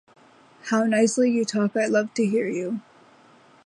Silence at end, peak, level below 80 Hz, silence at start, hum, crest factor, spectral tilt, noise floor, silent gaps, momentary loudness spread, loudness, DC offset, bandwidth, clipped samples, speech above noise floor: 0.85 s; -8 dBFS; -76 dBFS; 0.65 s; none; 16 dB; -5 dB/octave; -54 dBFS; none; 11 LU; -23 LUFS; under 0.1%; 11.5 kHz; under 0.1%; 32 dB